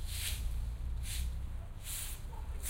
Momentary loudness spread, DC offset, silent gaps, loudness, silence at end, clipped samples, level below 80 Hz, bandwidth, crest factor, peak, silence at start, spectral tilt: 7 LU; under 0.1%; none; -41 LUFS; 0 s; under 0.1%; -40 dBFS; 16 kHz; 14 dB; -24 dBFS; 0 s; -2.5 dB/octave